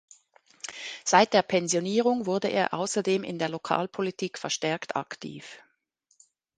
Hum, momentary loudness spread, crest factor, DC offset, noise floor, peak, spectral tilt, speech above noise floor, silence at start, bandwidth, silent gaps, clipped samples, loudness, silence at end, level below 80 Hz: none; 17 LU; 24 dB; under 0.1%; -71 dBFS; -4 dBFS; -3.5 dB/octave; 45 dB; 0.65 s; 10 kHz; none; under 0.1%; -27 LUFS; 1 s; -72 dBFS